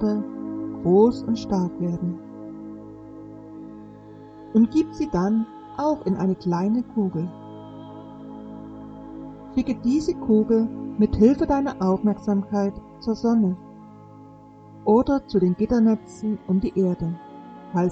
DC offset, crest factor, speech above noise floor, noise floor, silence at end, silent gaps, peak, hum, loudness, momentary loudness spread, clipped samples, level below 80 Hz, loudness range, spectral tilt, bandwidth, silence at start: under 0.1%; 20 dB; 25 dB; -46 dBFS; 0 s; none; -4 dBFS; none; -23 LUFS; 21 LU; under 0.1%; -46 dBFS; 7 LU; -8.5 dB/octave; 8 kHz; 0 s